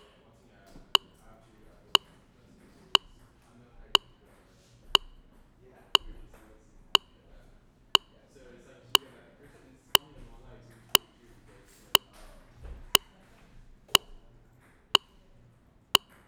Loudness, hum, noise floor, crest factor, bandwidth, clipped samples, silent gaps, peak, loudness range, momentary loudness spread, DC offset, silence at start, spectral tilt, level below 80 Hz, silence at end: -26 LUFS; none; -61 dBFS; 32 dB; 19.5 kHz; under 0.1%; none; 0 dBFS; 1 LU; 1 LU; under 0.1%; 10.95 s; 0 dB/octave; -56 dBFS; 0.3 s